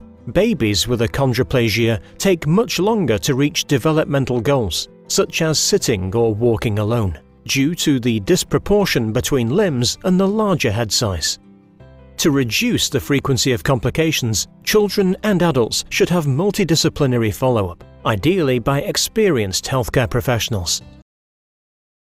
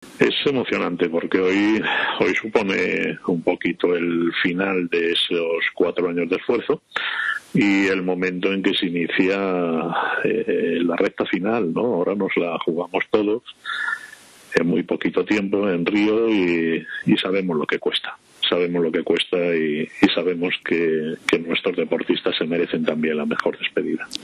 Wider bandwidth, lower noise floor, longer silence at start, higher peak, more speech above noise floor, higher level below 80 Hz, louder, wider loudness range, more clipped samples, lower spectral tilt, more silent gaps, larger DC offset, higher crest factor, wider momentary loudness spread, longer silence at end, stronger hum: first, 16 kHz vs 11.5 kHz; about the same, -44 dBFS vs -44 dBFS; about the same, 0 s vs 0 s; about the same, -4 dBFS vs -6 dBFS; first, 27 dB vs 23 dB; first, -40 dBFS vs -60 dBFS; first, -17 LUFS vs -21 LUFS; about the same, 1 LU vs 2 LU; neither; about the same, -4.5 dB/octave vs -5.5 dB/octave; neither; neither; about the same, 14 dB vs 16 dB; about the same, 4 LU vs 5 LU; first, 1.1 s vs 0 s; neither